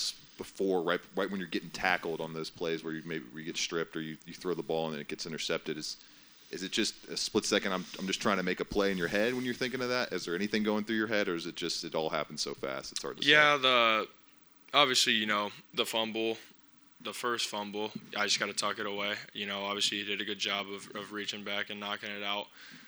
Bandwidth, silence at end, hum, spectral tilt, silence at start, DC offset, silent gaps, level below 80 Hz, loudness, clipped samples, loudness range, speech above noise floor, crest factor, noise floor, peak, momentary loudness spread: over 20 kHz; 0 s; none; -2.5 dB/octave; 0 s; under 0.1%; none; -66 dBFS; -32 LUFS; under 0.1%; 9 LU; 27 dB; 26 dB; -60 dBFS; -8 dBFS; 13 LU